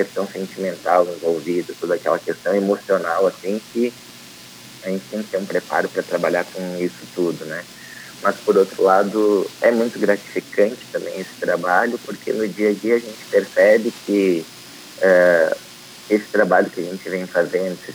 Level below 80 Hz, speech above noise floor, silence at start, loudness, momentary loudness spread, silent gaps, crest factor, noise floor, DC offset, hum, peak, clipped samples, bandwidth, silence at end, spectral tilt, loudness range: -68 dBFS; 21 dB; 0 s; -20 LUFS; 14 LU; none; 18 dB; -41 dBFS; under 0.1%; none; -2 dBFS; under 0.1%; 20 kHz; 0 s; -5 dB/octave; 6 LU